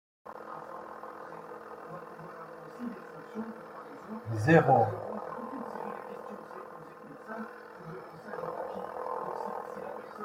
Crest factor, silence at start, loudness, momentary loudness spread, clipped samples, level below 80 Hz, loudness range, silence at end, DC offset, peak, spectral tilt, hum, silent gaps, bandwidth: 26 dB; 0.25 s; -34 LUFS; 19 LU; under 0.1%; -72 dBFS; 13 LU; 0 s; under 0.1%; -8 dBFS; -8 dB/octave; none; none; 15.5 kHz